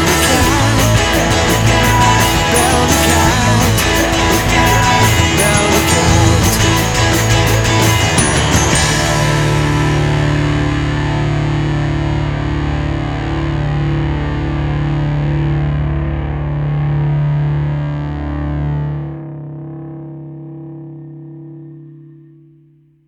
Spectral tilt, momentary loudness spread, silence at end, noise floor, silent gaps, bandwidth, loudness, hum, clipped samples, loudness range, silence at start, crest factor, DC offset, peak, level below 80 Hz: -4.5 dB/octave; 17 LU; 1 s; -49 dBFS; none; over 20 kHz; -13 LUFS; none; under 0.1%; 12 LU; 0 s; 14 dB; under 0.1%; 0 dBFS; -24 dBFS